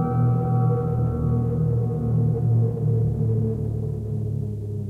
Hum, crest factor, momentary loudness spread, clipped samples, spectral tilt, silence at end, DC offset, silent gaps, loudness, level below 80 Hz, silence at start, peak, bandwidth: none; 10 dB; 7 LU; under 0.1%; -12 dB/octave; 0 s; under 0.1%; none; -23 LUFS; -38 dBFS; 0 s; -12 dBFS; 1.7 kHz